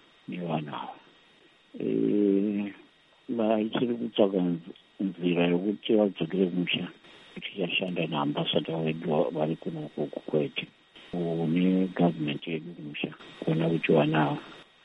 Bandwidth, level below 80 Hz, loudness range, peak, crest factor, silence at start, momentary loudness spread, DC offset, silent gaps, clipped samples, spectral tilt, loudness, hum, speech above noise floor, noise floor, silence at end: 5.6 kHz; -72 dBFS; 3 LU; -8 dBFS; 20 dB; 0.3 s; 13 LU; under 0.1%; none; under 0.1%; -8.5 dB/octave; -28 LUFS; none; 32 dB; -60 dBFS; 0.2 s